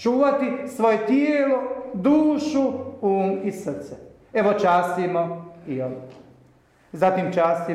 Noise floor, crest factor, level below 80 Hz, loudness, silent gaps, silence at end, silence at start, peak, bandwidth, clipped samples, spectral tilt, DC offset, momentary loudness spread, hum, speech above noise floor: -56 dBFS; 14 dB; -62 dBFS; -22 LUFS; none; 0 s; 0 s; -8 dBFS; 13.5 kHz; under 0.1%; -7 dB/octave; under 0.1%; 13 LU; none; 35 dB